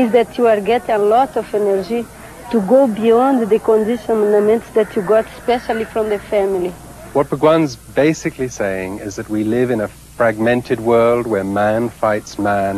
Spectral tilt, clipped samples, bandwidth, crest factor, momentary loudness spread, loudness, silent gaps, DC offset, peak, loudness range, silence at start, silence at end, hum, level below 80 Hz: -6 dB/octave; under 0.1%; 14 kHz; 14 dB; 8 LU; -16 LUFS; none; under 0.1%; 0 dBFS; 3 LU; 0 s; 0 s; none; -46 dBFS